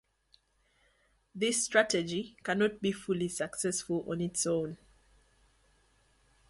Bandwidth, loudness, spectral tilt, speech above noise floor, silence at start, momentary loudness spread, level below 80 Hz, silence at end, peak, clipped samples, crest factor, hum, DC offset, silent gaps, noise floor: 12 kHz; -32 LUFS; -3.5 dB/octave; 40 dB; 1.35 s; 10 LU; -66 dBFS; 1.75 s; -12 dBFS; under 0.1%; 24 dB; none; under 0.1%; none; -72 dBFS